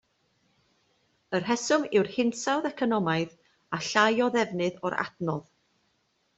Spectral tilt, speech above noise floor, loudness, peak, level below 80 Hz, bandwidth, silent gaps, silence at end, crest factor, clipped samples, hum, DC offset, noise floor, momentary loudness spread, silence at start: -4.5 dB/octave; 46 dB; -27 LUFS; -8 dBFS; -70 dBFS; 8.2 kHz; none; 0.95 s; 22 dB; under 0.1%; none; under 0.1%; -72 dBFS; 10 LU; 1.3 s